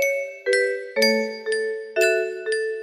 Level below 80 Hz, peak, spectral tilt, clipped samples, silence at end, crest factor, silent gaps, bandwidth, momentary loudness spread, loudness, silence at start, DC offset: -72 dBFS; -6 dBFS; -2 dB/octave; under 0.1%; 0 s; 16 dB; none; 14.5 kHz; 6 LU; -22 LUFS; 0 s; under 0.1%